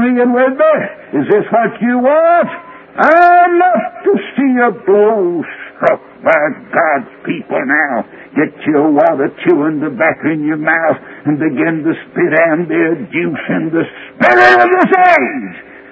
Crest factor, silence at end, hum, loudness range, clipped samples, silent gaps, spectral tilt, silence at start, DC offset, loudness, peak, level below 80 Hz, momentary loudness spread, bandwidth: 12 dB; 0.1 s; none; 4 LU; 0.2%; none; -7.5 dB/octave; 0 s; under 0.1%; -12 LUFS; 0 dBFS; -58 dBFS; 11 LU; 8 kHz